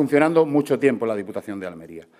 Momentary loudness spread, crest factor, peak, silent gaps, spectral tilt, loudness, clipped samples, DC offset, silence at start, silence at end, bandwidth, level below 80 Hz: 16 LU; 20 dB; -2 dBFS; none; -7 dB/octave; -21 LUFS; under 0.1%; under 0.1%; 0 s; 0.2 s; 15 kHz; -68 dBFS